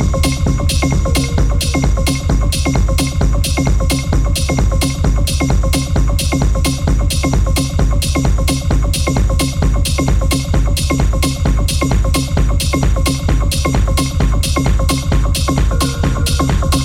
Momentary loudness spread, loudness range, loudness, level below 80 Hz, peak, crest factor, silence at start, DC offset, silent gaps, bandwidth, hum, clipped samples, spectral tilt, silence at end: 1 LU; 0 LU; -15 LUFS; -16 dBFS; -4 dBFS; 8 dB; 0 s; under 0.1%; none; 16.5 kHz; none; under 0.1%; -5 dB/octave; 0 s